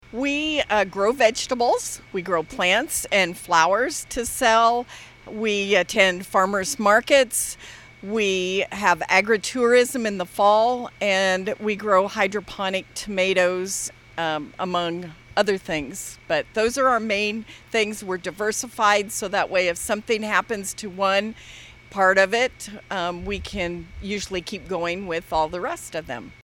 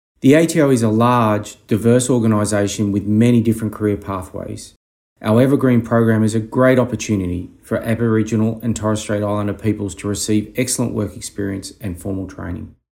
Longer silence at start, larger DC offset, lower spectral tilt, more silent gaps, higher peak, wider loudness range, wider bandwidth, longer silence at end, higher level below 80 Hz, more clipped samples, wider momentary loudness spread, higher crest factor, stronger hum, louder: second, 0.1 s vs 0.25 s; neither; second, -3 dB/octave vs -6 dB/octave; second, none vs 4.76-5.16 s; about the same, -2 dBFS vs 0 dBFS; about the same, 4 LU vs 5 LU; first, 18.5 kHz vs 16.5 kHz; second, 0.1 s vs 0.25 s; about the same, -50 dBFS vs -48 dBFS; neither; about the same, 12 LU vs 13 LU; about the same, 20 dB vs 16 dB; neither; second, -22 LUFS vs -17 LUFS